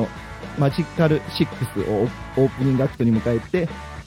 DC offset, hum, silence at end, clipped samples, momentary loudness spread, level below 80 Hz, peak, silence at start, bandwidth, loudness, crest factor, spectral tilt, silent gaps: under 0.1%; none; 0 s; under 0.1%; 7 LU; -42 dBFS; -6 dBFS; 0 s; 16 kHz; -22 LUFS; 16 dB; -7.5 dB/octave; none